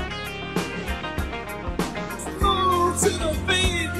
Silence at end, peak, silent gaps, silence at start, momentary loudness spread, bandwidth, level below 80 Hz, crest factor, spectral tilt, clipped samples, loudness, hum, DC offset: 0 s; -8 dBFS; none; 0 s; 10 LU; 16 kHz; -34 dBFS; 16 dB; -4 dB/octave; under 0.1%; -24 LUFS; none; 0.4%